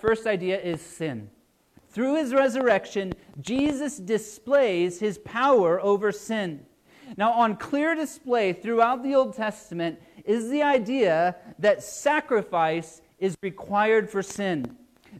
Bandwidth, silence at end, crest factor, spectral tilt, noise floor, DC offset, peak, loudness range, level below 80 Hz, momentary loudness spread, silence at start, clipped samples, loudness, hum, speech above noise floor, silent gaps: 15 kHz; 0 s; 18 dB; -5 dB/octave; -60 dBFS; under 0.1%; -8 dBFS; 2 LU; -60 dBFS; 11 LU; 0.05 s; under 0.1%; -25 LUFS; none; 35 dB; none